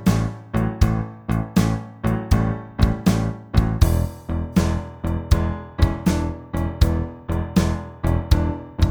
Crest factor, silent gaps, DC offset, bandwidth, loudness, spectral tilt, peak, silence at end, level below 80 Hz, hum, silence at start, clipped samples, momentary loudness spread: 18 dB; none; under 0.1%; over 20 kHz; -22 LUFS; -7 dB/octave; -2 dBFS; 0 s; -26 dBFS; none; 0 s; under 0.1%; 7 LU